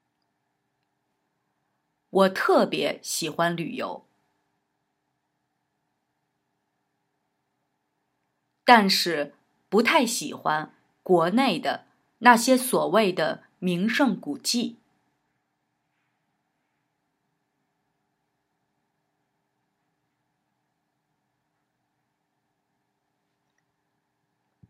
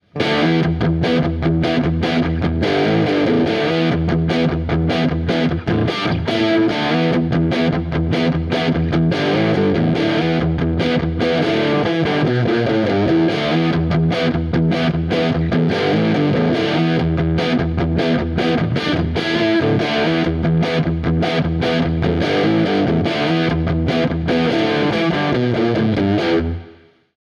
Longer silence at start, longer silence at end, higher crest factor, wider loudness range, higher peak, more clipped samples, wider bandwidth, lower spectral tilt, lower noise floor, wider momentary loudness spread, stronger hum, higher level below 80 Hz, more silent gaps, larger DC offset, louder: first, 2.15 s vs 0.15 s; first, 10 s vs 0.5 s; first, 28 dB vs 12 dB; first, 11 LU vs 1 LU; first, 0 dBFS vs -4 dBFS; neither; first, 16 kHz vs 7.2 kHz; second, -4 dB/octave vs -7.5 dB/octave; first, -77 dBFS vs -45 dBFS; first, 14 LU vs 3 LU; neither; second, -86 dBFS vs -32 dBFS; neither; neither; second, -23 LUFS vs -17 LUFS